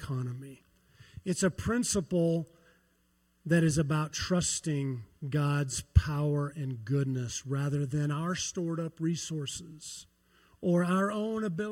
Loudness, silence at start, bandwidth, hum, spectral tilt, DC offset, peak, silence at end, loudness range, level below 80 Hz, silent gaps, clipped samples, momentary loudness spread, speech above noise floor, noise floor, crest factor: -31 LUFS; 0 s; 15.5 kHz; none; -5.5 dB/octave; under 0.1%; -8 dBFS; 0 s; 3 LU; -46 dBFS; none; under 0.1%; 13 LU; 40 dB; -71 dBFS; 24 dB